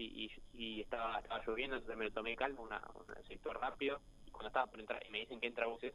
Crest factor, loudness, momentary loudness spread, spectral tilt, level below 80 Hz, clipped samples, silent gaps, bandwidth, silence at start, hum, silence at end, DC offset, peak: 24 dB; -43 LUFS; 9 LU; -4.5 dB/octave; -60 dBFS; under 0.1%; none; 12.5 kHz; 0 s; none; 0 s; under 0.1%; -20 dBFS